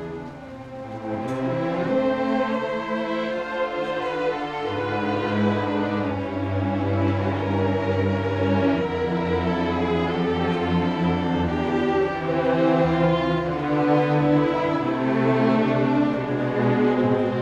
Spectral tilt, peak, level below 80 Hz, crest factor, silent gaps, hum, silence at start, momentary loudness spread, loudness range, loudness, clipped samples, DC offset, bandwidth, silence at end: -8 dB/octave; -8 dBFS; -48 dBFS; 14 dB; none; none; 0 s; 7 LU; 4 LU; -23 LUFS; under 0.1%; under 0.1%; 8.6 kHz; 0 s